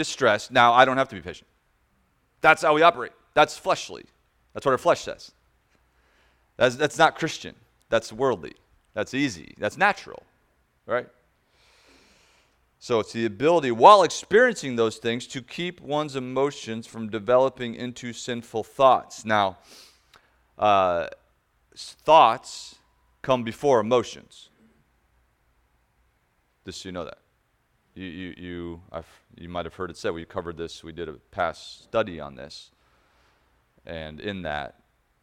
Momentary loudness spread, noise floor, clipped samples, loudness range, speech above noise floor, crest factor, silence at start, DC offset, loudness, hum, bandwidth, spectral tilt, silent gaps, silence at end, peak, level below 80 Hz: 21 LU; -69 dBFS; under 0.1%; 17 LU; 45 dB; 24 dB; 0 s; under 0.1%; -23 LUFS; none; 15 kHz; -4 dB/octave; none; 0.55 s; 0 dBFS; -58 dBFS